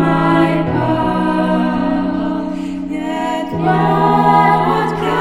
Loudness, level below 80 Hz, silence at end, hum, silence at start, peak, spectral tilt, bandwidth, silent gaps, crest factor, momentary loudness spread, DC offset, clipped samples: -15 LUFS; -38 dBFS; 0 s; none; 0 s; 0 dBFS; -7.5 dB/octave; 12.5 kHz; none; 14 dB; 10 LU; under 0.1%; under 0.1%